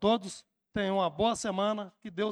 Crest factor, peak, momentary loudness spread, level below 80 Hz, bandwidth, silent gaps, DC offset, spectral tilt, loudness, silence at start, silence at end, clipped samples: 18 dB; -14 dBFS; 13 LU; -60 dBFS; 12 kHz; none; under 0.1%; -4.5 dB/octave; -31 LUFS; 0 s; 0 s; under 0.1%